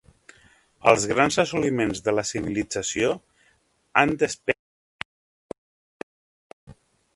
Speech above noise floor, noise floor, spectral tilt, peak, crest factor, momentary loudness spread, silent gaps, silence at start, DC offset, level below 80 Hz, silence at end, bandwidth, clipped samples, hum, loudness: 42 dB; -65 dBFS; -4 dB/octave; 0 dBFS; 26 dB; 23 LU; 4.59-4.99 s, 5.05-5.49 s, 5.58-6.67 s; 0.85 s; under 0.1%; -54 dBFS; 0.4 s; 11.5 kHz; under 0.1%; none; -23 LUFS